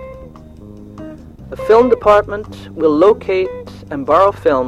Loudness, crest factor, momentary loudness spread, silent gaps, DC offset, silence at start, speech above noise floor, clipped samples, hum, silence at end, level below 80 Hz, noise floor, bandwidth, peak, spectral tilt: -13 LUFS; 14 dB; 22 LU; none; under 0.1%; 0 s; 23 dB; under 0.1%; 50 Hz at -45 dBFS; 0 s; -40 dBFS; -36 dBFS; 11 kHz; 0 dBFS; -7 dB/octave